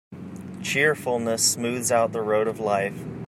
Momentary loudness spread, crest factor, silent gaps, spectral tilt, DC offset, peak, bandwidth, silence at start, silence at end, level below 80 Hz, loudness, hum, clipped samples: 13 LU; 18 dB; none; -3 dB/octave; under 0.1%; -6 dBFS; 16 kHz; 0.1 s; 0 s; -64 dBFS; -23 LUFS; none; under 0.1%